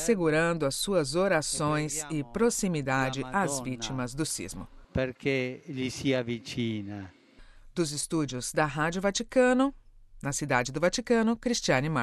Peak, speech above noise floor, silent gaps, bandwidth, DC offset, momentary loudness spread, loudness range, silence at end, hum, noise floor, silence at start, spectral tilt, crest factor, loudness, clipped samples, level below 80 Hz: -10 dBFS; 24 dB; none; 13.5 kHz; under 0.1%; 9 LU; 5 LU; 0 s; none; -53 dBFS; 0 s; -4.5 dB/octave; 18 dB; -29 LUFS; under 0.1%; -50 dBFS